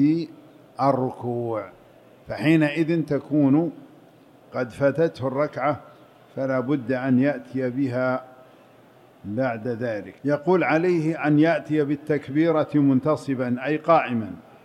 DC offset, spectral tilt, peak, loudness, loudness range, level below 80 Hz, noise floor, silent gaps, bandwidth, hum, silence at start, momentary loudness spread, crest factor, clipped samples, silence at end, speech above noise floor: under 0.1%; -8.5 dB/octave; -6 dBFS; -23 LUFS; 5 LU; -66 dBFS; -52 dBFS; none; 9.8 kHz; none; 0 s; 11 LU; 18 dB; under 0.1%; 0.25 s; 30 dB